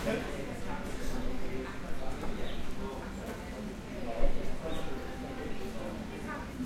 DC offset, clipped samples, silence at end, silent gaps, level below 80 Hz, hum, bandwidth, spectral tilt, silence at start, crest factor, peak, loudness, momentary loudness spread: under 0.1%; under 0.1%; 0 s; none; -38 dBFS; none; 13.5 kHz; -5.5 dB/octave; 0 s; 20 dB; -12 dBFS; -39 LUFS; 5 LU